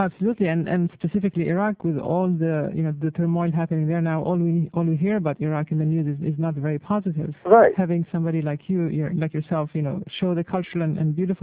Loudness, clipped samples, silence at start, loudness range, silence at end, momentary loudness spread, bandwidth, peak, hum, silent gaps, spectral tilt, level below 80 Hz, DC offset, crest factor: -23 LUFS; under 0.1%; 0 s; 3 LU; 0.05 s; 4 LU; 4 kHz; -2 dBFS; none; none; -12.5 dB/octave; -58 dBFS; under 0.1%; 20 dB